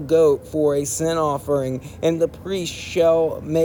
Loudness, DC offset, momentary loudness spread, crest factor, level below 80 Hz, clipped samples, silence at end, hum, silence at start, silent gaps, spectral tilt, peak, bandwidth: -21 LUFS; under 0.1%; 9 LU; 14 dB; -48 dBFS; under 0.1%; 0 s; none; 0 s; none; -5 dB/octave; -6 dBFS; 19.5 kHz